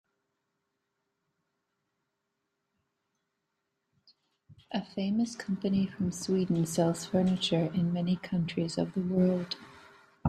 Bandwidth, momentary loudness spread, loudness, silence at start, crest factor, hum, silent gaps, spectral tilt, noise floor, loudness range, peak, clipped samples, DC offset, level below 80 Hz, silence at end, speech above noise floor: 13 kHz; 6 LU; -31 LUFS; 4.5 s; 20 dB; none; none; -6 dB/octave; -83 dBFS; 9 LU; -12 dBFS; under 0.1%; under 0.1%; -66 dBFS; 0 s; 53 dB